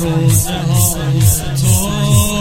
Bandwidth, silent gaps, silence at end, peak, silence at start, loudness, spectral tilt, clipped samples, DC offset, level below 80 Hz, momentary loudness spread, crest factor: 16.5 kHz; none; 0 s; 0 dBFS; 0 s; -13 LUFS; -4.5 dB/octave; under 0.1%; under 0.1%; -28 dBFS; 2 LU; 12 dB